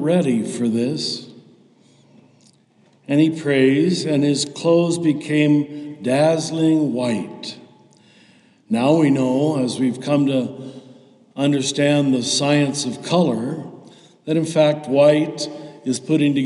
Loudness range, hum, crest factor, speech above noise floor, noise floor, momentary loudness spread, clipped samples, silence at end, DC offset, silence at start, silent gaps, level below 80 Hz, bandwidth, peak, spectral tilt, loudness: 3 LU; none; 16 dB; 38 dB; -56 dBFS; 13 LU; under 0.1%; 0 s; under 0.1%; 0 s; none; -72 dBFS; 11.5 kHz; -4 dBFS; -5.5 dB/octave; -19 LUFS